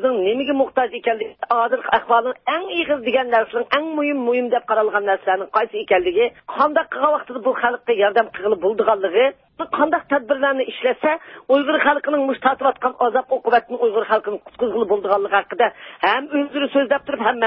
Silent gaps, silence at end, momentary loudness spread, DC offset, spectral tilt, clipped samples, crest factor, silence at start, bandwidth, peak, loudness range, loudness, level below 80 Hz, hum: none; 0 s; 4 LU; under 0.1%; -8.5 dB/octave; under 0.1%; 16 dB; 0 s; 5.6 kHz; -2 dBFS; 1 LU; -19 LUFS; -62 dBFS; none